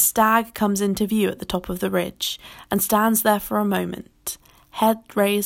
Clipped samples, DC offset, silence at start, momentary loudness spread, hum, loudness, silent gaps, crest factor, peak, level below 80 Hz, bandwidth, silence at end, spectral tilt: under 0.1%; under 0.1%; 0 s; 14 LU; none; -22 LUFS; none; 18 dB; -4 dBFS; -50 dBFS; 17 kHz; 0 s; -4 dB/octave